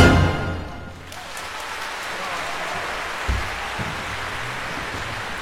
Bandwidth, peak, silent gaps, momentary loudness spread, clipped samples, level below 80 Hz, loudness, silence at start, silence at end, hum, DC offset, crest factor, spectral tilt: 16 kHz; 0 dBFS; none; 8 LU; under 0.1%; -34 dBFS; -26 LUFS; 0 s; 0 s; none; 0.2%; 24 dB; -5 dB/octave